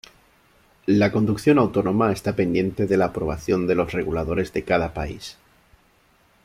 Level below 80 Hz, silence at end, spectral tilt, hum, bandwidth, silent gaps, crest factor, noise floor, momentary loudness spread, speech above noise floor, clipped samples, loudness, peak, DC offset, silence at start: -44 dBFS; 1.15 s; -7 dB/octave; none; 15.5 kHz; none; 18 dB; -59 dBFS; 10 LU; 38 dB; under 0.1%; -22 LUFS; -6 dBFS; under 0.1%; 0.85 s